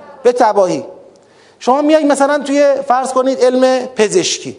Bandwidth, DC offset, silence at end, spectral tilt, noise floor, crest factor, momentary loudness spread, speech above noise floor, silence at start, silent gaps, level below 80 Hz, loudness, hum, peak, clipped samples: 11 kHz; under 0.1%; 0.05 s; -3.5 dB/octave; -45 dBFS; 14 dB; 5 LU; 33 dB; 0 s; none; -64 dBFS; -13 LUFS; none; 0 dBFS; 0.1%